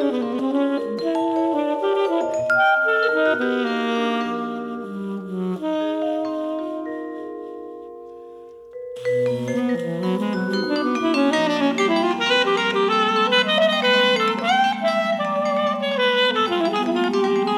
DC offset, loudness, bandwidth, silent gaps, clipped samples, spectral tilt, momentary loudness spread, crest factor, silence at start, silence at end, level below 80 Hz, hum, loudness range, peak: under 0.1%; -20 LUFS; 14 kHz; none; under 0.1%; -5 dB/octave; 13 LU; 14 dB; 0 s; 0 s; -68 dBFS; none; 9 LU; -8 dBFS